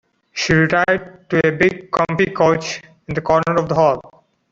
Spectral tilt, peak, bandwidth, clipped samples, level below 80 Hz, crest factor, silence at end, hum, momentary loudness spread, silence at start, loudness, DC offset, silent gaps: -5.5 dB/octave; -2 dBFS; 7.8 kHz; under 0.1%; -46 dBFS; 16 dB; 0.45 s; none; 12 LU; 0.35 s; -17 LUFS; under 0.1%; none